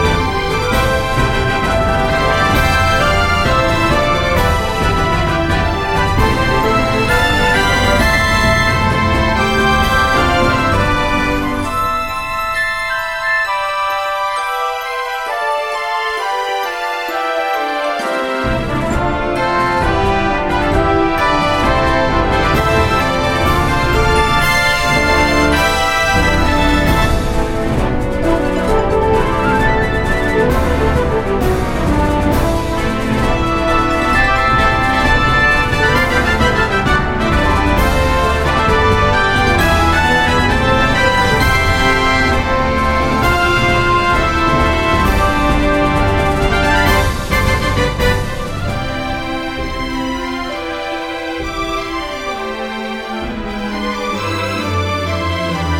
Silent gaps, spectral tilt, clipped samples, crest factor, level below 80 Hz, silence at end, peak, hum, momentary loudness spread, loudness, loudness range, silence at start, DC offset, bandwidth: none; -5 dB/octave; under 0.1%; 14 dB; -22 dBFS; 0 s; 0 dBFS; none; 8 LU; -14 LUFS; 6 LU; 0 s; under 0.1%; 16.5 kHz